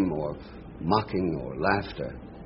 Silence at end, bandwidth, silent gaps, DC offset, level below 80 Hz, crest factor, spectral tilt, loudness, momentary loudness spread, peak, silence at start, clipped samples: 0 s; 5.8 kHz; none; under 0.1%; -46 dBFS; 22 dB; -5.5 dB/octave; -29 LUFS; 12 LU; -8 dBFS; 0 s; under 0.1%